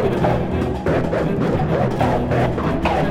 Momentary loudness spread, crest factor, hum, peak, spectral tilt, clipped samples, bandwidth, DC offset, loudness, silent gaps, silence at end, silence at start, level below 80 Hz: 2 LU; 14 dB; none; -4 dBFS; -8 dB/octave; under 0.1%; 14.5 kHz; under 0.1%; -19 LUFS; none; 0 s; 0 s; -32 dBFS